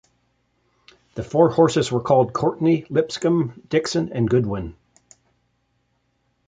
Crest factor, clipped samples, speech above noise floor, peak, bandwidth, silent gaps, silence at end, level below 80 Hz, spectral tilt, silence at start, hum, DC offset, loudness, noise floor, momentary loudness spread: 20 dB; under 0.1%; 49 dB; -2 dBFS; 9.4 kHz; none; 1.75 s; -50 dBFS; -6.5 dB/octave; 1.15 s; none; under 0.1%; -20 LUFS; -69 dBFS; 10 LU